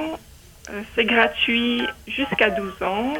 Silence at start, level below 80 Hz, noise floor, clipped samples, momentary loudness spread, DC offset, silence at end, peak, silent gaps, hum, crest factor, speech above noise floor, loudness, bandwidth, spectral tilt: 0 s; -48 dBFS; -45 dBFS; under 0.1%; 15 LU; under 0.1%; 0 s; -2 dBFS; none; none; 20 dB; 24 dB; -21 LUFS; 17.5 kHz; -4.5 dB/octave